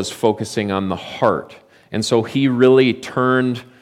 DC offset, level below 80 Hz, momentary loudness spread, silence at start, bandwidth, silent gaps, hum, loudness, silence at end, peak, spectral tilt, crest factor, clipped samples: under 0.1%; -58 dBFS; 11 LU; 0 s; 14 kHz; none; none; -18 LUFS; 0.2 s; -2 dBFS; -5.5 dB/octave; 16 dB; under 0.1%